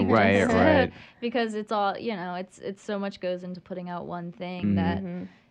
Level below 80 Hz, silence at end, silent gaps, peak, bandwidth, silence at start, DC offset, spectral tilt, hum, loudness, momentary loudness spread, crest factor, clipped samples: -58 dBFS; 0.25 s; none; -8 dBFS; 9.6 kHz; 0 s; under 0.1%; -6.5 dB/octave; none; -26 LUFS; 16 LU; 18 dB; under 0.1%